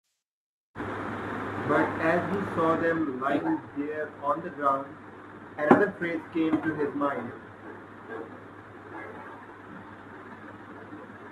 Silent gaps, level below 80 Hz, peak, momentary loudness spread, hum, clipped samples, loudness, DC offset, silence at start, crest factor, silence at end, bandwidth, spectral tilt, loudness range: none; -66 dBFS; -2 dBFS; 20 LU; none; under 0.1%; -28 LUFS; under 0.1%; 0.75 s; 28 dB; 0 s; 11.5 kHz; -7.5 dB/octave; 15 LU